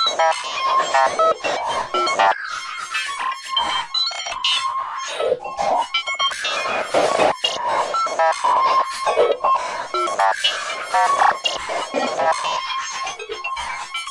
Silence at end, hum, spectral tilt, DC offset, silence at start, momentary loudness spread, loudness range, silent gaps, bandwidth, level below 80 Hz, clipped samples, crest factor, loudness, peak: 0 s; none; -0.5 dB/octave; under 0.1%; 0 s; 8 LU; 2 LU; none; 11.5 kHz; -58 dBFS; under 0.1%; 16 dB; -20 LUFS; -4 dBFS